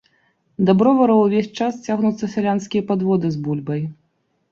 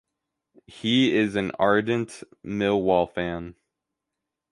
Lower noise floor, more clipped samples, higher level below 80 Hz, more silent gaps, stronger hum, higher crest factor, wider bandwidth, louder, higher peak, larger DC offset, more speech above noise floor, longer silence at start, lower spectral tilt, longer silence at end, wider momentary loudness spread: second, -67 dBFS vs -85 dBFS; neither; about the same, -60 dBFS vs -56 dBFS; neither; neither; about the same, 16 dB vs 20 dB; second, 7.4 kHz vs 11.5 kHz; first, -19 LUFS vs -24 LUFS; first, -2 dBFS vs -6 dBFS; neither; second, 49 dB vs 61 dB; about the same, 0.6 s vs 0.7 s; first, -7.5 dB/octave vs -6 dB/octave; second, 0.6 s vs 1 s; second, 11 LU vs 15 LU